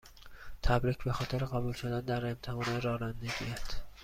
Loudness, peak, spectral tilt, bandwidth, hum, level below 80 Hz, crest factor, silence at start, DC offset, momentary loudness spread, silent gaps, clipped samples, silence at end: -35 LUFS; -14 dBFS; -6 dB/octave; 15 kHz; none; -44 dBFS; 20 dB; 0.05 s; under 0.1%; 12 LU; none; under 0.1%; 0 s